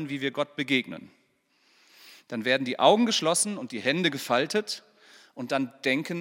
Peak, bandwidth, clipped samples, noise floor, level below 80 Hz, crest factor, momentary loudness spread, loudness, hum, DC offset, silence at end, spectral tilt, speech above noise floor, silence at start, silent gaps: -6 dBFS; 17 kHz; under 0.1%; -68 dBFS; -84 dBFS; 22 dB; 15 LU; -26 LUFS; none; under 0.1%; 0 s; -3 dB/octave; 41 dB; 0 s; none